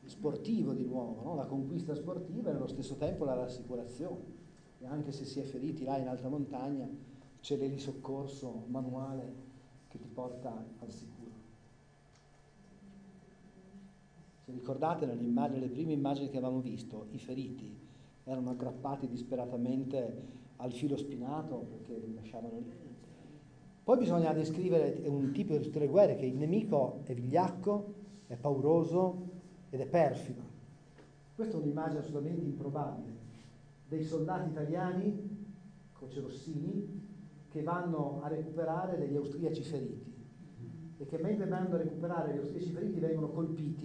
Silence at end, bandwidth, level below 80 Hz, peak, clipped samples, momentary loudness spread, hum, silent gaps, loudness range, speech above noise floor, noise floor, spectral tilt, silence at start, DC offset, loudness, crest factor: 0 s; 10 kHz; -68 dBFS; -16 dBFS; under 0.1%; 20 LU; none; none; 11 LU; 27 dB; -63 dBFS; -8.5 dB/octave; 0 s; under 0.1%; -36 LUFS; 22 dB